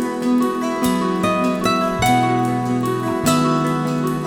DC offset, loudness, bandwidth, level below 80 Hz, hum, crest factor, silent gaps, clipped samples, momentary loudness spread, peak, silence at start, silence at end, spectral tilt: under 0.1%; -18 LUFS; 18.5 kHz; -46 dBFS; none; 14 dB; none; under 0.1%; 4 LU; -4 dBFS; 0 s; 0 s; -5.5 dB/octave